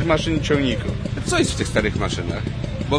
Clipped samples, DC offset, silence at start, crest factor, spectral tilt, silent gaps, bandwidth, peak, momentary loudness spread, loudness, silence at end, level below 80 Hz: under 0.1%; under 0.1%; 0 s; 18 dB; -5 dB/octave; none; 11 kHz; -4 dBFS; 7 LU; -22 LUFS; 0 s; -32 dBFS